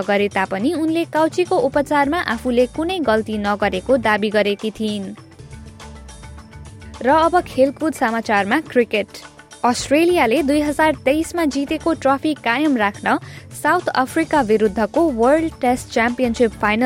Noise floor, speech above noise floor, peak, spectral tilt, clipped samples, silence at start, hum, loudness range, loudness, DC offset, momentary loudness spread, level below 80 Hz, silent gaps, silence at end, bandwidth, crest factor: -38 dBFS; 20 dB; -4 dBFS; -5 dB/octave; under 0.1%; 0 s; none; 4 LU; -18 LUFS; under 0.1%; 17 LU; -44 dBFS; none; 0 s; 16.5 kHz; 14 dB